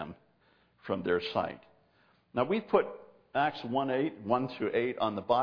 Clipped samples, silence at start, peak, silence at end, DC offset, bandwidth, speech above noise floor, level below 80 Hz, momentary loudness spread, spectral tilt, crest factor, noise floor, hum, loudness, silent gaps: under 0.1%; 0 s; -12 dBFS; 0 s; under 0.1%; 5.4 kHz; 37 dB; -70 dBFS; 10 LU; -8 dB/octave; 20 dB; -68 dBFS; none; -32 LUFS; none